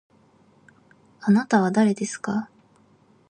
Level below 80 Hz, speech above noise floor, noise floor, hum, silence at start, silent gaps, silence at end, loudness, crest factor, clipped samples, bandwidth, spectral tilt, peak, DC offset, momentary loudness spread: -70 dBFS; 37 dB; -58 dBFS; none; 1.2 s; none; 0.85 s; -22 LUFS; 18 dB; under 0.1%; 9.8 kHz; -6 dB/octave; -8 dBFS; under 0.1%; 11 LU